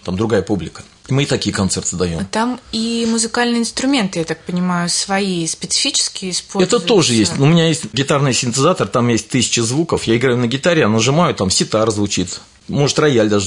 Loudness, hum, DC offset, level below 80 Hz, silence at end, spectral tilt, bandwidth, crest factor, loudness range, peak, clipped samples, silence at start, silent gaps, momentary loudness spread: -16 LUFS; none; under 0.1%; -48 dBFS; 0 s; -4 dB/octave; 11 kHz; 14 dB; 3 LU; -2 dBFS; under 0.1%; 0.05 s; none; 7 LU